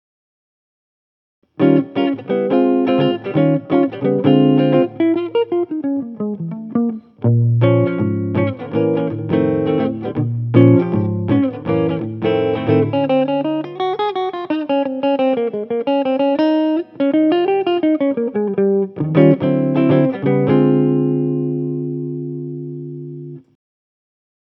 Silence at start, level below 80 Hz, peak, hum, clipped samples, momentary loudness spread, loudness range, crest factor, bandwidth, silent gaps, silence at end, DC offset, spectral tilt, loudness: 1.6 s; -60 dBFS; 0 dBFS; none; under 0.1%; 9 LU; 3 LU; 16 dB; 5.6 kHz; none; 1.05 s; under 0.1%; -11 dB/octave; -17 LUFS